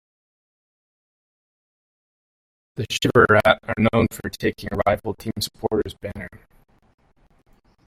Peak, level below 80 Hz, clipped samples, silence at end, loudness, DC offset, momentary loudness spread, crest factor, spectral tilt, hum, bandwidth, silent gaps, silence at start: -2 dBFS; -48 dBFS; under 0.1%; 1.5 s; -21 LUFS; under 0.1%; 19 LU; 22 dB; -5.5 dB/octave; none; 16 kHz; none; 2.75 s